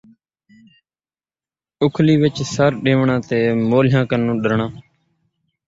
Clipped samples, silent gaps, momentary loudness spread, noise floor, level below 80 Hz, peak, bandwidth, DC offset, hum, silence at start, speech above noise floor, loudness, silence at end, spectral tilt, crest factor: under 0.1%; none; 6 LU; under -90 dBFS; -52 dBFS; -2 dBFS; 7.8 kHz; under 0.1%; none; 1.8 s; over 74 dB; -17 LUFS; 0.85 s; -7 dB/octave; 16 dB